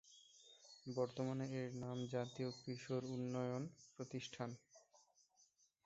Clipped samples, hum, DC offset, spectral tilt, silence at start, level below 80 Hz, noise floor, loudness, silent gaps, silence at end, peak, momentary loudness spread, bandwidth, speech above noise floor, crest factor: under 0.1%; none; under 0.1%; -6.5 dB/octave; 0.05 s; -82 dBFS; -77 dBFS; -46 LUFS; none; 0.9 s; -28 dBFS; 17 LU; 8 kHz; 31 dB; 20 dB